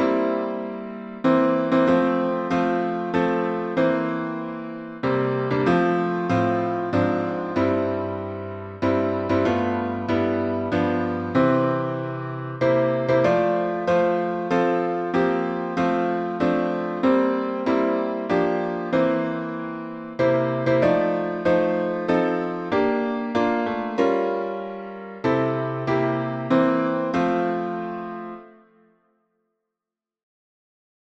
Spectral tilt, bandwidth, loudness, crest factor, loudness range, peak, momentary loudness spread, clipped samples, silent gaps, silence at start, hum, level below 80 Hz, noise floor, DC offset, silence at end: -8 dB/octave; 7.8 kHz; -23 LUFS; 16 dB; 2 LU; -6 dBFS; 10 LU; under 0.1%; none; 0 s; none; -58 dBFS; -88 dBFS; under 0.1%; 2.55 s